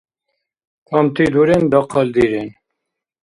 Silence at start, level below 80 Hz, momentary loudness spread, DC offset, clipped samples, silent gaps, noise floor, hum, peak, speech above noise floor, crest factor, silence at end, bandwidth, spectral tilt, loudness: 0.9 s; -48 dBFS; 8 LU; under 0.1%; under 0.1%; none; -79 dBFS; none; 0 dBFS; 64 dB; 16 dB; 0.7 s; 11.5 kHz; -7.5 dB/octave; -15 LUFS